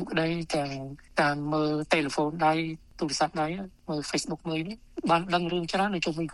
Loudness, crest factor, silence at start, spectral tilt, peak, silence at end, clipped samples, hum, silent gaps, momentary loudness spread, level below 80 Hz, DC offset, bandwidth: -28 LUFS; 22 dB; 0 s; -5 dB/octave; -8 dBFS; 0 s; under 0.1%; none; none; 9 LU; -56 dBFS; under 0.1%; 12 kHz